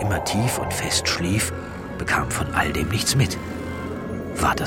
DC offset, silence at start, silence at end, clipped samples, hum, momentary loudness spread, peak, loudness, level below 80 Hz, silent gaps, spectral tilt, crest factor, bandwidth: under 0.1%; 0 s; 0 s; under 0.1%; none; 10 LU; -6 dBFS; -23 LUFS; -38 dBFS; none; -4 dB/octave; 18 dB; 16.5 kHz